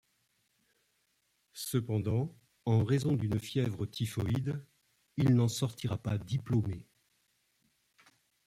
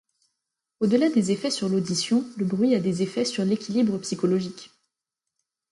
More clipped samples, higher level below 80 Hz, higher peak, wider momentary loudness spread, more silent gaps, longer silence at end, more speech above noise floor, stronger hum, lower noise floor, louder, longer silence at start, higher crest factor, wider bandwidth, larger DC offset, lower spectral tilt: neither; first, -62 dBFS vs -68 dBFS; second, -16 dBFS vs -10 dBFS; first, 12 LU vs 6 LU; neither; first, 1.65 s vs 1.05 s; second, 45 dB vs 62 dB; neither; second, -76 dBFS vs -86 dBFS; second, -33 LUFS vs -24 LUFS; first, 1.55 s vs 0.8 s; about the same, 16 dB vs 16 dB; first, 15.5 kHz vs 11.5 kHz; neither; about the same, -6.5 dB/octave vs -5.5 dB/octave